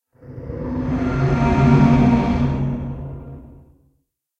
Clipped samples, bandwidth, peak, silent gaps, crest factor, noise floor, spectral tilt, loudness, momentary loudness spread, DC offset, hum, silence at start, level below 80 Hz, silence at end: under 0.1%; 7.2 kHz; -2 dBFS; none; 16 dB; -68 dBFS; -9 dB/octave; -18 LUFS; 22 LU; under 0.1%; none; 0.25 s; -32 dBFS; 0.9 s